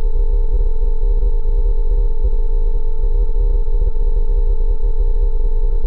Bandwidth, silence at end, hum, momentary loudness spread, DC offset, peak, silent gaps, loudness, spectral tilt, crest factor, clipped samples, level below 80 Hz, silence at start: 1 kHz; 0 s; none; 2 LU; under 0.1%; -6 dBFS; none; -22 LUFS; -11 dB/octave; 6 dB; under 0.1%; -12 dBFS; 0 s